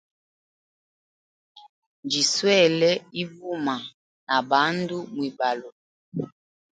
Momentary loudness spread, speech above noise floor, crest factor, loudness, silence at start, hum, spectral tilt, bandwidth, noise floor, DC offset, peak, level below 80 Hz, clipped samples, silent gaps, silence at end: 16 LU; over 67 dB; 22 dB; -24 LUFS; 1.55 s; none; -3.5 dB/octave; 9.4 kHz; under -90 dBFS; under 0.1%; -4 dBFS; -74 dBFS; under 0.1%; 1.69-2.03 s, 3.94-4.27 s, 5.72-6.12 s; 0.5 s